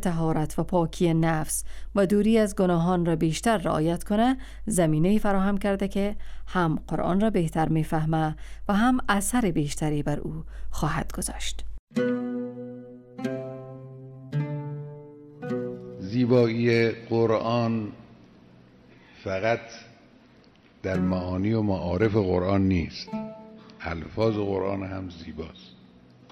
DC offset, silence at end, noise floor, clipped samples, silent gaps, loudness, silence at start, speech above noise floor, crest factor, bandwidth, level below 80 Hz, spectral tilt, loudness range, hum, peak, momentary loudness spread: under 0.1%; 0.6 s; -55 dBFS; under 0.1%; 11.79-11.87 s; -26 LUFS; 0 s; 31 dB; 18 dB; 16 kHz; -42 dBFS; -6 dB/octave; 9 LU; none; -8 dBFS; 16 LU